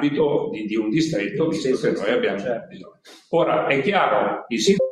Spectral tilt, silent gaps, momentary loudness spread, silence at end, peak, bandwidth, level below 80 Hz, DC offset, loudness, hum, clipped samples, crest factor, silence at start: -5 dB/octave; none; 6 LU; 0 s; -4 dBFS; 12.5 kHz; -62 dBFS; under 0.1%; -21 LUFS; none; under 0.1%; 18 dB; 0 s